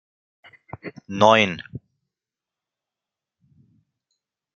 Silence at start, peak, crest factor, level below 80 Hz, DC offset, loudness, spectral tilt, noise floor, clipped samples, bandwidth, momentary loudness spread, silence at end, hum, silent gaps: 0.85 s; 0 dBFS; 26 dB; -64 dBFS; under 0.1%; -17 LUFS; -4.5 dB/octave; -89 dBFS; under 0.1%; 7.4 kHz; 26 LU; 2.75 s; none; none